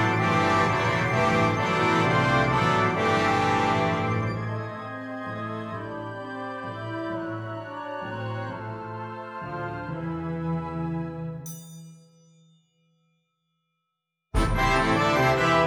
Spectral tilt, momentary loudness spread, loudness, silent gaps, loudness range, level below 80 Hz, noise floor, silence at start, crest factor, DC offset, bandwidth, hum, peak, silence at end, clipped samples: -6 dB/octave; 14 LU; -26 LUFS; none; 13 LU; -42 dBFS; -82 dBFS; 0 s; 18 dB; under 0.1%; over 20 kHz; none; -10 dBFS; 0 s; under 0.1%